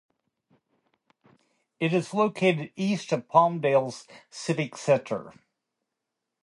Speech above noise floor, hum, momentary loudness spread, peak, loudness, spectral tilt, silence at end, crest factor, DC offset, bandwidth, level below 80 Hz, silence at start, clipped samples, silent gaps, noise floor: 59 dB; none; 13 LU; -4 dBFS; -26 LUFS; -6 dB/octave; 1.15 s; 24 dB; under 0.1%; 11.5 kHz; -76 dBFS; 1.8 s; under 0.1%; none; -84 dBFS